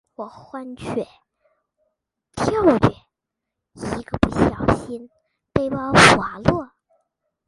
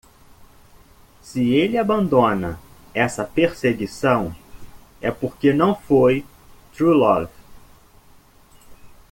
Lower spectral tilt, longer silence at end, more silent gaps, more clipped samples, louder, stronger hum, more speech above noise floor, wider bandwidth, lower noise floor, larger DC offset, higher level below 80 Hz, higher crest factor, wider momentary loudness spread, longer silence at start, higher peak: second, -5 dB/octave vs -6.5 dB/octave; first, 0.8 s vs 0.25 s; neither; neither; about the same, -19 LUFS vs -20 LUFS; neither; first, 64 dB vs 32 dB; second, 11.5 kHz vs 17 kHz; first, -83 dBFS vs -50 dBFS; neither; first, -40 dBFS vs -48 dBFS; about the same, 22 dB vs 18 dB; first, 23 LU vs 12 LU; second, 0.2 s vs 1.25 s; about the same, 0 dBFS vs -2 dBFS